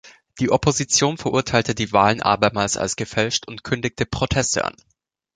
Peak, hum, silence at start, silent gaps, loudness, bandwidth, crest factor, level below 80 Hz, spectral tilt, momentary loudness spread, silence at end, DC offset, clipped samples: -2 dBFS; none; 0.05 s; none; -20 LUFS; 9.6 kHz; 20 dB; -44 dBFS; -3.5 dB/octave; 7 LU; 0.65 s; under 0.1%; under 0.1%